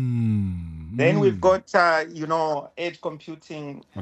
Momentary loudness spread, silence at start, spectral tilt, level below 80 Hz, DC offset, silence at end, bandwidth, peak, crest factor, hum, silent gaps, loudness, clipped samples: 17 LU; 0 s; -7 dB/octave; -50 dBFS; under 0.1%; 0 s; 9.4 kHz; -4 dBFS; 18 dB; none; none; -22 LUFS; under 0.1%